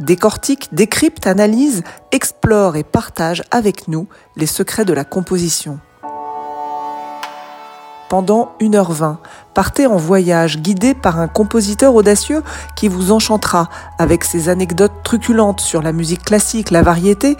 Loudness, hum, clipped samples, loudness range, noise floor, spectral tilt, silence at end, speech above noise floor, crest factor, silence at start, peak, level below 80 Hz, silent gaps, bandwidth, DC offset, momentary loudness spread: -14 LUFS; none; under 0.1%; 6 LU; -35 dBFS; -5 dB/octave; 0 s; 21 dB; 14 dB; 0 s; 0 dBFS; -34 dBFS; none; 17 kHz; under 0.1%; 14 LU